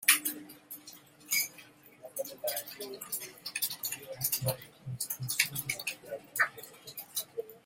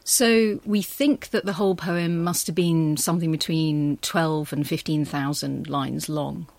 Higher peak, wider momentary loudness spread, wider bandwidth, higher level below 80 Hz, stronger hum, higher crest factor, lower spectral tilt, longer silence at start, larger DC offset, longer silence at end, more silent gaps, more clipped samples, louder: about the same, -6 dBFS vs -6 dBFS; first, 16 LU vs 6 LU; about the same, 17 kHz vs 16.5 kHz; second, -72 dBFS vs -58 dBFS; neither; first, 30 dB vs 16 dB; second, -1.5 dB/octave vs -4.5 dB/octave; about the same, 0 s vs 0.05 s; neither; about the same, 0.05 s vs 0.1 s; neither; neither; second, -34 LUFS vs -23 LUFS